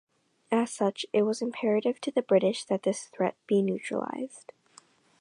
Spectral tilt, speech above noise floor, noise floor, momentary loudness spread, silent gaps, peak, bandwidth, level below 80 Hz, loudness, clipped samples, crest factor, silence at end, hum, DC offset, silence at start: -5.5 dB/octave; 31 dB; -59 dBFS; 8 LU; none; -12 dBFS; 11 kHz; -82 dBFS; -29 LUFS; under 0.1%; 18 dB; 0.8 s; none; under 0.1%; 0.5 s